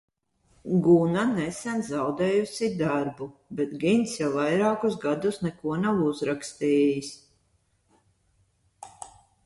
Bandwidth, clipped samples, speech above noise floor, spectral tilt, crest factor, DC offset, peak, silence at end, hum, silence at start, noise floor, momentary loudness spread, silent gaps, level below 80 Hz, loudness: 11.5 kHz; under 0.1%; 44 dB; -6 dB/octave; 18 dB; under 0.1%; -8 dBFS; 0.4 s; none; 0.65 s; -69 dBFS; 15 LU; none; -64 dBFS; -26 LUFS